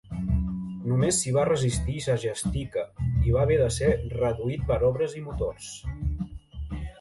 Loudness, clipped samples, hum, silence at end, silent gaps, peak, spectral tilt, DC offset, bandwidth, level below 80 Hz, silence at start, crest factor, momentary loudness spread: -27 LUFS; under 0.1%; none; 0.1 s; none; -10 dBFS; -5.5 dB/octave; under 0.1%; 11.5 kHz; -36 dBFS; 0.05 s; 16 dB; 13 LU